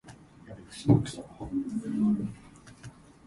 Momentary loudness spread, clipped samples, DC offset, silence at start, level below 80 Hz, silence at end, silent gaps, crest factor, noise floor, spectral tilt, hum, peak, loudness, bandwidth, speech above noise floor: 24 LU; under 0.1%; under 0.1%; 0.05 s; -54 dBFS; 0.35 s; none; 22 dB; -50 dBFS; -7.5 dB/octave; none; -8 dBFS; -29 LUFS; 11.5 kHz; 22 dB